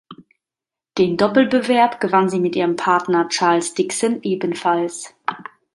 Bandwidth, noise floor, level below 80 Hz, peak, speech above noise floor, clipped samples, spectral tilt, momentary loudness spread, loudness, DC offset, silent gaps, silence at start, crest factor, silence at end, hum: 11.5 kHz; -88 dBFS; -62 dBFS; -2 dBFS; 71 dB; under 0.1%; -4.5 dB/octave; 11 LU; -18 LUFS; under 0.1%; none; 0.1 s; 18 dB; 0.35 s; none